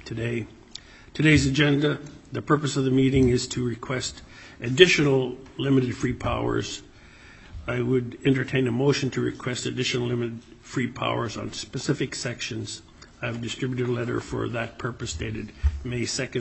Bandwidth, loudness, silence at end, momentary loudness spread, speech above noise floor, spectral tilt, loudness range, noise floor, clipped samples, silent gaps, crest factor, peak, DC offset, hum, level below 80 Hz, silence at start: 8.4 kHz; -25 LUFS; 0 s; 15 LU; 24 dB; -5 dB/octave; 7 LU; -49 dBFS; under 0.1%; none; 26 dB; 0 dBFS; under 0.1%; none; -42 dBFS; 0 s